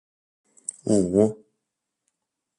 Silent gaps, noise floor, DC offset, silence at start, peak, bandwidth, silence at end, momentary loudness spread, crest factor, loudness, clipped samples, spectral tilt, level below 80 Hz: none; -82 dBFS; under 0.1%; 0.85 s; -6 dBFS; 11.5 kHz; 1.25 s; 16 LU; 22 dB; -23 LUFS; under 0.1%; -7 dB/octave; -58 dBFS